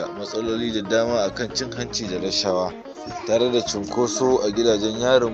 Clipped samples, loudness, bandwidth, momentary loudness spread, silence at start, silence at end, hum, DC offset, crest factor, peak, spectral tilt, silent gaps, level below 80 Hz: under 0.1%; -22 LUFS; 8.4 kHz; 8 LU; 0 s; 0 s; none; under 0.1%; 18 dB; -4 dBFS; -4 dB/octave; none; -50 dBFS